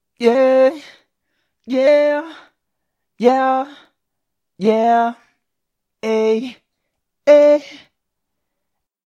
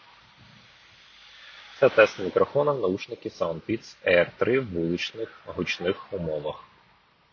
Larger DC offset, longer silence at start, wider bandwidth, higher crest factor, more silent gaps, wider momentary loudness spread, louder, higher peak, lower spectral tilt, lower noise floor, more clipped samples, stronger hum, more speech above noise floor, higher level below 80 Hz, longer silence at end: neither; second, 0.2 s vs 1.4 s; first, 9 kHz vs 7 kHz; second, 18 dB vs 24 dB; neither; second, 13 LU vs 16 LU; first, -15 LUFS vs -26 LUFS; first, 0 dBFS vs -4 dBFS; about the same, -5.5 dB/octave vs -5.5 dB/octave; first, -79 dBFS vs -61 dBFS; neither; neither; first, 64 dB vs 35 dB; second, -74 dBFS vs -56 dBFS; first, 1.3 s vs 0.7 s